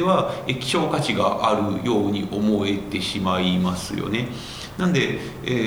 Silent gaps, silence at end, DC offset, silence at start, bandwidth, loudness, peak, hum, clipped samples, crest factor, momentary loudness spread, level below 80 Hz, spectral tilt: none; 0 s; under 0.1%; 0 s; over 20 kHz; -23 LUFS; -4 dBFS; none; under 0.1%; 18 dB; 6 LU; -48 dBFS; -5.5 dB/octave